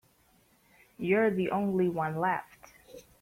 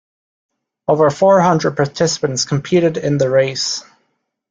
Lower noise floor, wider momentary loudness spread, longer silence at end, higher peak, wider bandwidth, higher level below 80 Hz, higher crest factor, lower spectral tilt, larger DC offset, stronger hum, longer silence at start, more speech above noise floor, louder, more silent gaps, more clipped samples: about the same, -66 dBFS vs -68 dBFS; about the same, 10 LU vs 8 LU; second, 0.2 s vs 0.7 s; second, -14 dBFS vs -2 dBFS; first, 16 kHz vs 9.4 kHz; second, -68 dBFS vs -54 dBFS; about the same, 18 dB vs 14 dB; first, -8 dB/octave vs -5 dB/octave; neither; neither; about the same, 1 s vs 0.9 s; second, 37 dB vs 53 dB; second, -29 LUFS vs -15 LUFS; neither; neither